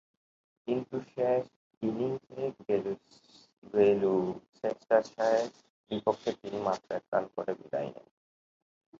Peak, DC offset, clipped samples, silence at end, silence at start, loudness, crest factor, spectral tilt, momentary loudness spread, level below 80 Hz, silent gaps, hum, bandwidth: -10 dBFS; under 0.1%; under 0.1%; 1 s; 0.65 s; -32 LUFS; 22 dB; -6.5 dB/octave; 12 LU; -72 dBFS; 1.56-1.70 s, 1.77-1.81 s, 3.53-3.62 s, 4.49-4.53 s, 5.70-5.84 s, 7.08-7.12 s; none; 7.6 kHz